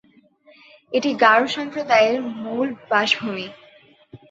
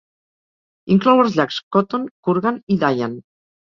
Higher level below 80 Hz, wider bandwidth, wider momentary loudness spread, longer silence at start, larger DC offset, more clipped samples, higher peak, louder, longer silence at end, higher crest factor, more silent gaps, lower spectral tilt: second, -68 dBFS vs -60 dBFS; first, 8 kHz vs 7.2 kHz; about the same, 13 LU vs 11 LU; about the same, 0.9 s vs 0.85 s; neither; neither; about the same, -2 dBFS vs -2 dBFS; about the same, -20 LUFS vs -18 LUFS; second, 0.15 s vs 0.4 s; about the same, 20 dB vs 18 dB; second, none vs 1.63-1.71 s, 2.11-2.23 s, 2.63-2.67 s; second, -3.5 dB/octave vs -7.5 dB/octave